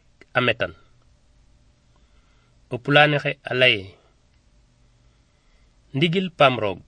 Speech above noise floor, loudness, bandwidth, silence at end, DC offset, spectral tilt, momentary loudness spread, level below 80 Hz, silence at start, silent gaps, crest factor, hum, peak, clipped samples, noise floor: 38 dB; -20 LUFS; 9.8 kHz; 0.1 s; under 0.1%; -6 dB/octave; 14 LU; -58 dBFS; 0.35 s; none; 24 dB; none; 0 dBFS; under 0.1%; -59 dBFS